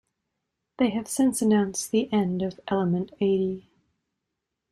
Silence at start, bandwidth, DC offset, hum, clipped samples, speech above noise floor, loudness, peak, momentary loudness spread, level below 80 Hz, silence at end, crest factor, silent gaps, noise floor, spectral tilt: 0.8 s; 15.5 kHz; under 0.1%; none; under 0.1%; 59 dB; -25 LUFS; -10 dBFS; 5 LU; -62 dBFS; 1.1 s; 16 dB; none; -83 dBFS; -5.5 dB/octave